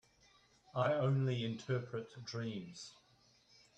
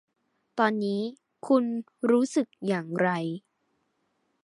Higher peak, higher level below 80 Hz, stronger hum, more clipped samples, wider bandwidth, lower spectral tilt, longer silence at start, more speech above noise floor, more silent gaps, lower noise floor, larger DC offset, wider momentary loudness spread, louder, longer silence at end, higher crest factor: second, -20 dBFS vs -8 dBFS; about the same, -76 dBFS vs -80 dBFS; neither; neither; second, 8.4 kHz vs 11.5 kHz; about the same, -6.5 dB/octave vs -6 dB/octave; first, 0.75 s vs 0.55 s; second, 32 dB vs 48 dB; neither; second, -70 dBFS vs -75 dBFS; neither; first, 15 LU vs 12 LU; second, -39 LUFS vs -27 LUFS; second, 0.9 s vs 1.05 s; about the same, 20 dB vs 20 dB